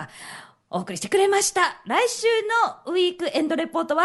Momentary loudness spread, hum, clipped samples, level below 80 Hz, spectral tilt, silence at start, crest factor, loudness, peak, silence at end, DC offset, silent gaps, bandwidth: 15 LU; none; under 0.1%; -70 dBFS; -2.5 dB/octave; 0 s; 18 dB; -22 LUFS; -6 dBFS; 0 s; under 0.1%; none; 12 kHz